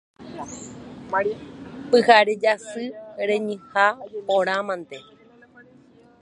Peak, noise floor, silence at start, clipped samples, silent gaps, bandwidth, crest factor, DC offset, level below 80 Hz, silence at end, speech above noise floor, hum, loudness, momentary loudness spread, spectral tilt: -2 dBFS; -52 dBFS; 0.2 s; under 0.1%; none; 11 kHz; 22 dB; under 0.1%; -64 dBFS; 1.2 s; 30 dB; none; -21 LUFS; 23 LU; -4 dB/octave